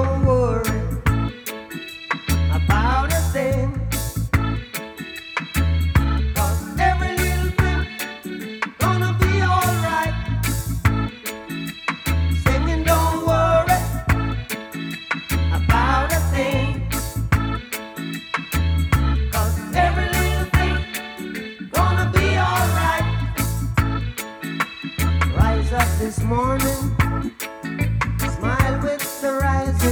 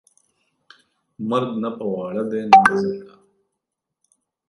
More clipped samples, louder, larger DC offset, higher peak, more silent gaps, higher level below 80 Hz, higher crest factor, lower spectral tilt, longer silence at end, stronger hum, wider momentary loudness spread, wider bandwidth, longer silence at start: neither; about the same, -21 LUFS vs -19 LUFS; neither; about the same, -2 dBFS vs 0 dBFS; neither; first, -26 dBFS vs -60 dBFS; about the same, 18 dB vs 22 dB; about the same, -5.5 dB/octave vs -5.5 dB/octave; second, 0 s vs 1.45 s; neither; second, 11 LU vs 14 LU; first, over 20 kHz vs 11.5 kHz; second, 0 s vs 1.2 s